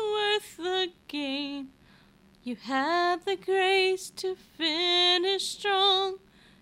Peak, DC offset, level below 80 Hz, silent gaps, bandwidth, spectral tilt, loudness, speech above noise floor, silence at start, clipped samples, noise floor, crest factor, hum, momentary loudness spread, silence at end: -12 dBFS; under 0.1%; -68 dBFS; none; 15.5 kHz; -1.5 dB/octave; -26 LUFS; 32 dB; 0 s; under 0.1%; -59 dBFS; 16 dB; none; 15 LU; 0.45 s